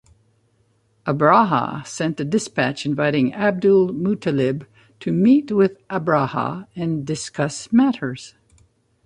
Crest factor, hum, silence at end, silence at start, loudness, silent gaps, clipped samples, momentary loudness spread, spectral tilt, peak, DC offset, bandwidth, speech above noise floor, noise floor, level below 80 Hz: 18 dB; none; 0.75 s; 1.05 s; -20 LUFS; none; under 0.1%; 11 LU; -6 dB/octave; -2 dBFS; under 0.1%; 11.5 kHz; 43 dB; -62 dBFS; -58 dBFS